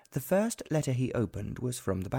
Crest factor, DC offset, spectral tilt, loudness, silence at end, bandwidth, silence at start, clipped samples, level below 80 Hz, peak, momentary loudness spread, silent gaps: 16 dB; under 0.1%; -6 dB/octave; -32 LUFS; 0 s; 19 kHz; 0.1 s; under 0.1%; -54 dBFS; -16 dBFS; 6 LU; none